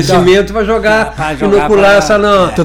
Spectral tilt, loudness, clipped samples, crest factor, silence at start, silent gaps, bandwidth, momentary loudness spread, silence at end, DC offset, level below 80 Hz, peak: -5 dB/octave; -9 LUFS; under 0.1%; 8 dB; 0 s; none; 17 kHz; 6 LU; 0 s; under 0.1%; -28 dBFS; 0 dBFS